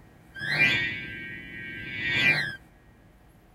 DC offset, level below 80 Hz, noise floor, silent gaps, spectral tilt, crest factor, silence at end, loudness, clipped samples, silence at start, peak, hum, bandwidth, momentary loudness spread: under 0.1%; -56 dBFS; -55 dBFS; none; -3.5 dB/octave; 20 dB; 0.95 s; -25 LUFS; under 0.1%; 0.35 s; -8 dBFS; none; 16 kHz; 16 LU